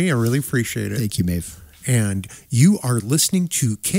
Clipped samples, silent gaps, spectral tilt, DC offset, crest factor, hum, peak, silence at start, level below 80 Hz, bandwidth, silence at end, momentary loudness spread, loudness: under 0.1%; none; -5 dB/octave; under 0.1%; 16 dB; none; -4 dBFS; 0 s; -46 dBFS; 16.5 kHz; 0 s; 10 LU; -20 LUFS